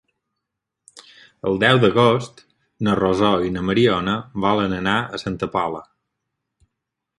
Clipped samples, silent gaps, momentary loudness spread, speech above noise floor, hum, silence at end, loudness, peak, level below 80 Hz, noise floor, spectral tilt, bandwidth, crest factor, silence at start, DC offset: under 0.1%; none; 12 LU; 62 dB; none; 1.35 s; -19 LUFS; 0 dBFS; -48 dBFS; -81 dBFS; -6.5 dB/octave; 11.5 kHz; 20 dB; 0.95 s; under 0.1%